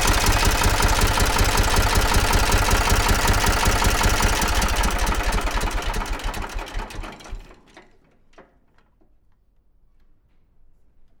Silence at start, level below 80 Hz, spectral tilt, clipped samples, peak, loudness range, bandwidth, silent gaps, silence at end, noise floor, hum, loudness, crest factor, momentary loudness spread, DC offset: 0 s; -24 dBFS; -3 dB/octave; under 0.1%; -4 dBFS; 17 LU; over 20 kHz; none; 2.8 s; -58 dBFS; none; -20 LUFS; 16 dB; 13 LU; under 0.1%